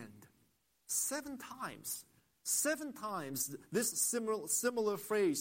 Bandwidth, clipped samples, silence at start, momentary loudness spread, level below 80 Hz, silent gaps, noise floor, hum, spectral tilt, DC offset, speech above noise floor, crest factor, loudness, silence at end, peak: 16.5 kHz; under 0.1%; 0 s; 12 LU; -80 dBFS; none; -75 dBFS; none; -2.5 dB/octave; under 0.1%; 38 dB; 18 dB; -36 LUFS; 0 s; -20 dBFS